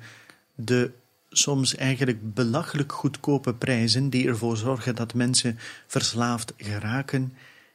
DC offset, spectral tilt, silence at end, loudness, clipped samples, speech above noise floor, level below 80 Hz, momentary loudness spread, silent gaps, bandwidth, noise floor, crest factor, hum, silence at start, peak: under 0.1%; -4 dB/octave; 0.4 s; -25 LUFS; under 0.1%; 26 dB; -64 dBFS; 9 LU; none; 15 kHz; -51 dBFS; 18 dB; none; 0 s; -8 dBFS